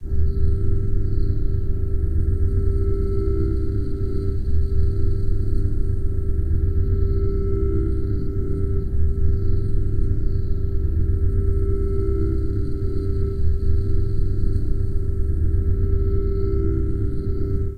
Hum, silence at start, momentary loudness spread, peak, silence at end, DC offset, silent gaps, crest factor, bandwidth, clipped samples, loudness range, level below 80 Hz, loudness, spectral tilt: none; 0 s; 3 LU; -6 dBFS; 0 s; 2%; none; 12 dB; 4.7 kHz; under 0.1%; 1 LU; -22 dBFS; -24 LUFS; -11 dB/octave